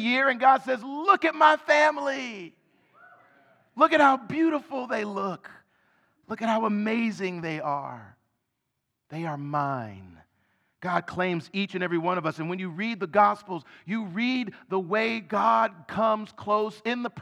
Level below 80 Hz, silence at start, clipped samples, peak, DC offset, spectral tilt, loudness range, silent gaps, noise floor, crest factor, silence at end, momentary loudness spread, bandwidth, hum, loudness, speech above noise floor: -74 dBFS; 0 s; under 0.1%; -6 dBFS; under 0.1%; -5.5 dB/octave; 9 LU; none; -81 dBFS; 22 dB; 0 s; 14 LU; 11.5 kHz; none; -25 LUFS; 55 dB